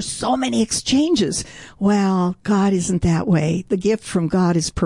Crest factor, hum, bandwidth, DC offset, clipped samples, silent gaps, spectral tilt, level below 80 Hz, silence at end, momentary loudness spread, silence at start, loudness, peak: 10 dB; none; 11.5 kHz; 0.1%; under 0.1%; none; -5.5 dB/octave; -42 dBFS; 0 s; 4 LU; 0 s; -19 LUFS; -8 dBFS